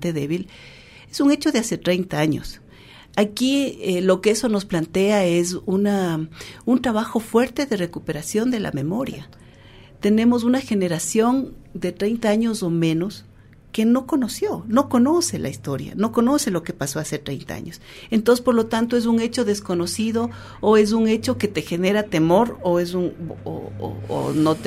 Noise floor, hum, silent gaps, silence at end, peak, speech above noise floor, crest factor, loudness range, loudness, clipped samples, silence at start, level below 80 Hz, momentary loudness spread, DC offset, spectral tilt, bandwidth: -46 dBFS; none; none; 0 s; -4 dBFS; 25 dB; 18 dB; 3 LU; -21 LUFS; under 0.1%; 0 s; -50 dBFS; 12 LU; under 0.1%; -5.5 dB/octave; 15.5 kHz